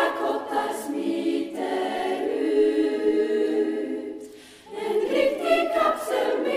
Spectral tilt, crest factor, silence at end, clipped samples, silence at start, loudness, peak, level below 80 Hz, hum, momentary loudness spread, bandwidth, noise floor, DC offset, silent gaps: -4 dB/octave; 16 dB; 0 s; under 0.1%; 0 s; -25 LUFS; -8 dBFS; -62 dBFS; none; 10 LU; 15.5 kHz; -44 dBFS; under 0.1%; none